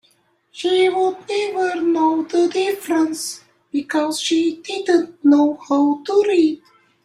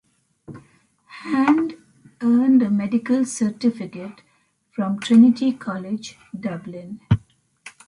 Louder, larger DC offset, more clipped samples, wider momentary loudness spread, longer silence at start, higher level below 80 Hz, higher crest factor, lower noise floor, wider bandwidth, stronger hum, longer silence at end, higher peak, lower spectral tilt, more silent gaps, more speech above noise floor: about the same, -19 LUFS vs -20 LUFS; neither; neither; second, 10 LU vs 19 LU; about the same, 0.55 s vs 0.5 s; second, -68 dBFS vs -50 dBFS; about the same, 14 dB vs 18 dB; about the same, -60 dBFS vs -62 dBFS; first, 15.5 kHz vs 11 kHz; neither; first, 0.5 s vs 0.2 s; about the same, -4 dBFS vs -4 dBFS; second, -3 dB/octave vs -6.5 dB/octave; neither; about the same, 43 dB vs 42 dB